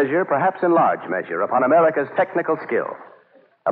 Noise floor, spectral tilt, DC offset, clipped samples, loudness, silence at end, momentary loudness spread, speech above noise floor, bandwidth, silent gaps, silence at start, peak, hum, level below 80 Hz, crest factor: -54 dBFS; -9.5 dB/octave; under 0.1%; under 0.1%; -20 LUFS; 0 s; 9 LU; 35 dB; 4.7 kHz; none; 0 s; -6 dBFS; none; -76 dBFS; 14 dB